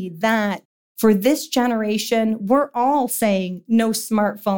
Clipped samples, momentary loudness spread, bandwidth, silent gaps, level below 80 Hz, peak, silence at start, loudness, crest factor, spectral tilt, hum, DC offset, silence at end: under 0.1%; 4 LU; 17 kHz; 0.65-0.95 s; -60 dBFS; -6 dBFS; 0 s; -19 LUFS; 14 dB; -4.5 dB/octave; none; 0.2%; 0 s